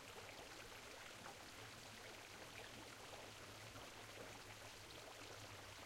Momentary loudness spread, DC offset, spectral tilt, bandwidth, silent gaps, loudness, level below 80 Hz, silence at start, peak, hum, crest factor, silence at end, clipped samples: 1 LU; under 0.1%; -2.5 dB/octave; 16 kHz; none; -56 LUFS; -74 dBFS; 0 s; -40 dBFS; none; 16 dB; 0 s; under 0.1%